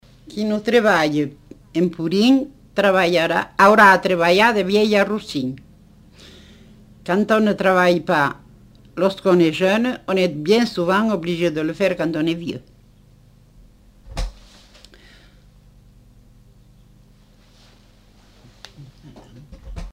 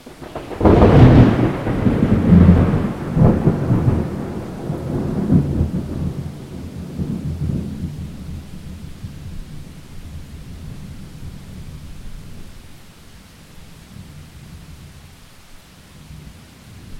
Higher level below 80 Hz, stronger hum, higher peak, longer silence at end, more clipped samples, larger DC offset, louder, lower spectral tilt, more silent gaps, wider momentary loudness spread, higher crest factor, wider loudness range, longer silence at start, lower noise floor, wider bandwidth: second, -44 dBFS vs -30 dBFS; first, 50 Hz at -50 dBFS vs none; about the same, -2 dBFS vs 0 dBFS; about the same, 0 s vs 0 s; neither; neither; about the same, -18 LUFS vs -16 LUFS; second, -5.5 dB/octave vs -9 dB/octave; neither; second, 18 LU vs 27 LU; about the same, 18 dB vs 18 dB; second, 10 LU vs 26 LU; first, 0.3 s vs 0.05 s; first, -51 dBFS vs -43 dBFS; first, 16 kHz vs 13.5 kHz